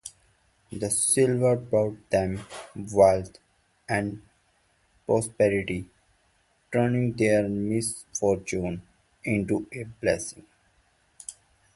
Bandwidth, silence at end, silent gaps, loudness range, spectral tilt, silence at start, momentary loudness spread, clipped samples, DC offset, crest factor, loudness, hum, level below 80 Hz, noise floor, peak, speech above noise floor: 12 kHz; 0.45 s; none; 5 LU; -5 dB/octave; 0.05 s; 19 LU; under 0.1%; under 0.1%; 20 dB; -26 LUFS; none; -54 dBFS; -67 dBFS; -6 dBFS; 42 dB